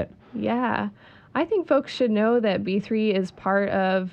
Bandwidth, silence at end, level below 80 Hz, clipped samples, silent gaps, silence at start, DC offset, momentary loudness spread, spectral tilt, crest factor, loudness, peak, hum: 8.4 kHz; 0 s; -60 dBFS; under 0.1%; none; 0 s; under 0.1%; 8 LU; -7 dB/octave; 14 dB; -24 LUFS; -8 dBFS; none